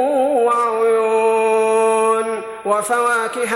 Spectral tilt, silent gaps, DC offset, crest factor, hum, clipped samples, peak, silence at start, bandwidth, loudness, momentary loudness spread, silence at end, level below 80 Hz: -3 dB/octave; none; under 0.1%; 12 dB; none; under 0.1%; -4 dBFS; 0 s; 13.5 kHz; -16 LUFS; 5 LU; 0 s; -64 dBFS